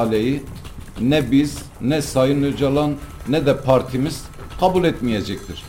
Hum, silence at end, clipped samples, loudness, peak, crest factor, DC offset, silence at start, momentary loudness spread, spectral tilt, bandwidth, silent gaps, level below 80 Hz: none; 0 s; under 0.1%; -20 LUFS; -4 dBFS; 16 dB; under 0.1%; 0 s; 12 LU; -6.5 dB/octave; 17 kHz; none; -38 dBFS